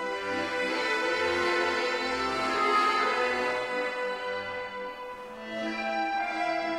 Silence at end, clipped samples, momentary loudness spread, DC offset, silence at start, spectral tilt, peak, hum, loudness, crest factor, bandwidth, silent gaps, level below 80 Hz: 0 s; under 0.1%; 11 LU; under 0.1%; 0 s; -3 dB/octave; -14 dBFS; none; -28 LUFS; 16 dB; 16 kHz; none; -62 dBFS